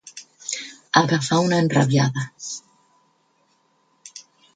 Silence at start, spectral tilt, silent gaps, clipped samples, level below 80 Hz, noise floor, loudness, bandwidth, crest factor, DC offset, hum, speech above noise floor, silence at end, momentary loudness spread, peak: 0.05 s; -5 dB/octave; none; under 0.1%; -62 dBFS; -64 dBFS; -21 LUFS; 9.6 kHz; 22 dB; under 0.1%; none; 45 dB; 0.35 s; 23 LU; 0 dBFS